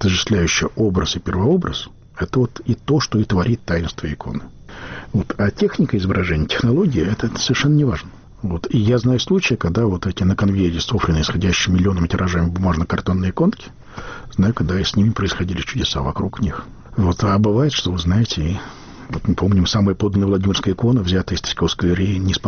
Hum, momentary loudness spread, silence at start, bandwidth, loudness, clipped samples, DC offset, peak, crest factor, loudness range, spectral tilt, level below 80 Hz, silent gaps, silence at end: none; 11 LU; 0 s; 6.8 kHz; -19 LUFS; under 0.1%; under 0.1%; -6 dBFS; 12 dB; 3 LU; -5.5 dB/octave; -34 dBFS; none; 0 s